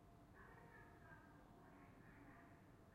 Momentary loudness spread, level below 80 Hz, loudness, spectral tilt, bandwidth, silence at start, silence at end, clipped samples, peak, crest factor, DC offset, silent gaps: 3 LU; -74 dBFS; -65 LUFS; -6.5 dB/octave; 15 kHz; 0 s; 0 s; under 0.1%; -52 dBFS; 14 dB; under 0.1%; none